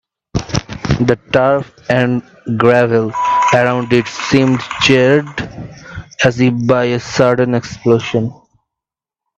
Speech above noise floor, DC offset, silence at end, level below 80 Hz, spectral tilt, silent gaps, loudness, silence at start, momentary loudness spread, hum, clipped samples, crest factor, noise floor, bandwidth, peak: 72 dB; under 0.1%; 1.05 s; -40 dBFS; -6 dB/octave; none; -14 LUFS; 0.35 s; 13 LU; none; under 0.1%; 14 dB; -85 dBFS; 8.4 kHz; 0 dBFS